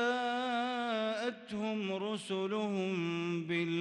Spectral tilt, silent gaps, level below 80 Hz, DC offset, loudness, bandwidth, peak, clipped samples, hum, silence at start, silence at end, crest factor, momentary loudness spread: -5.5 dB/octave; none; -80 dBFS; under 0.1%; -35 LUFS; 11.5 kHz; -22 dBFS; under 0.1%; none; 0 s; 0 s; 14 dB; 4 LU